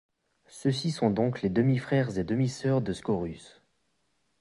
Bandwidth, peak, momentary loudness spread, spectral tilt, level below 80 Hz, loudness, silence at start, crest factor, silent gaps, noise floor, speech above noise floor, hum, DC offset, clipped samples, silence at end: 11.5 kHz; -10 dBFS; 6 LU; -7 dB/octave; -56 dBFS; -28 LUFS; 0.55 s; 18 dB; none; -75 dBFS; 48 dB; none; under 0.1%; under 0.1%; 0.95 s